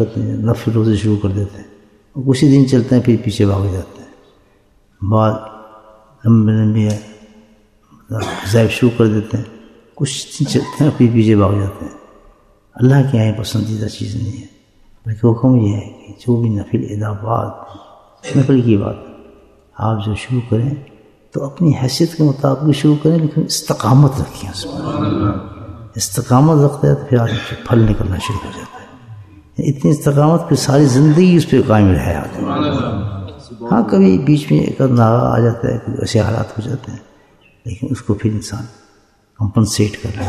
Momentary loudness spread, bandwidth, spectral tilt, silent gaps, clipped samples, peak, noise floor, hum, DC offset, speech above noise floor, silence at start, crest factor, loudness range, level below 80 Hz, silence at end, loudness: 15 LU; 13.5 kHz; -7 dB/octave; none; under 0.1%; 0 dBFS; -53 dBFS; none; under 0.1%; 39 dB; 0 s; 14 dB; 5 LU; -40 dBFS; 0 s; -15 LUFS